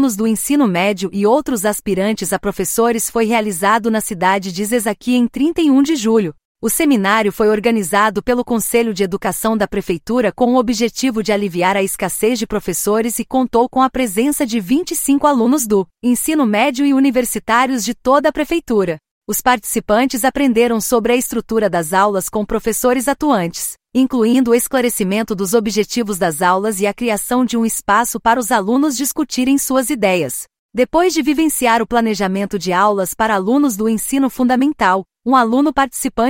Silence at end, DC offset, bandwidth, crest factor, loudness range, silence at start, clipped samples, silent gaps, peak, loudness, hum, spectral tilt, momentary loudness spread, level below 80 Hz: 0 s; under 0.1%; 16.5 kHz; 14 dB; 2 LU; 0 s; under 0.1%; 6.45-6.55 s, 19.11-19.22 s, 30.59-30.69 s; 0 dBFS; -16 LUFS; none; -4 dB/octave; 5 LU; -44 dBFS